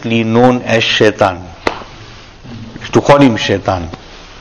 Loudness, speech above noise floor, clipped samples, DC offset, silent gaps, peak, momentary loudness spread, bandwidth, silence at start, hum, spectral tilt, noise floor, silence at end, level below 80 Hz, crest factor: -12 LUFS; 23 dB; 1%; under 0.1%; none; 0 dBFS; 22 LU; 11 kHz; 0 s; none; -5.5 dB/octave; -34 dBFS; 0 s; -38 dBFS; 14 dB